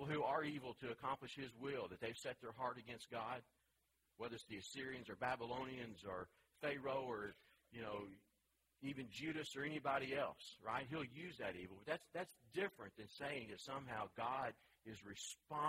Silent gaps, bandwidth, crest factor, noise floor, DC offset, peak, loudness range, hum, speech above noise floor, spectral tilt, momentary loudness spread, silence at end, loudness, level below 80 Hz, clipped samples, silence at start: none; 16 kHz; 20 dB; -84 dBFS; under 0.1%; -28 dBFS; 4 LU; none; 36 dB; -4.5 dB/octave; 10 LU; 0 s; -48 LUFS; -78 dBFS; under 0.1%; 0 s